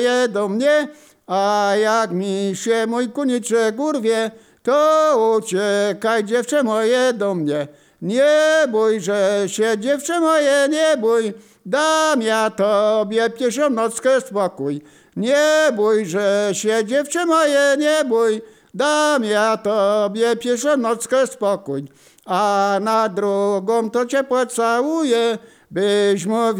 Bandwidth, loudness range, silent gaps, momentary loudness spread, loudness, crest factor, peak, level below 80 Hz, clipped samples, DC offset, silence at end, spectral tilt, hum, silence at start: 16.5 kHz; 2 LU; none; 7 LU; -18 LUFS; 12 dB; -6 dBFS; -72 dBFS; under 0.1%; under 0.1%; 0 s; -4 dB/octave; none; 0 s